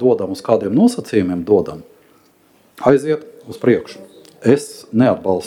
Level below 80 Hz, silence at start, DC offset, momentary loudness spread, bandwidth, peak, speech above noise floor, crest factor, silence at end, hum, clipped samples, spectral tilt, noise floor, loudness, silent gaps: -56 dBFS; 0 s; under 0.1%; 9 LU; 14.5 kHz; 0 dBFS; 37 dB; 18 dB; 0 s; none; under 0.1%; -7 dB/octave; -53 dBFS; -17 LUFS; none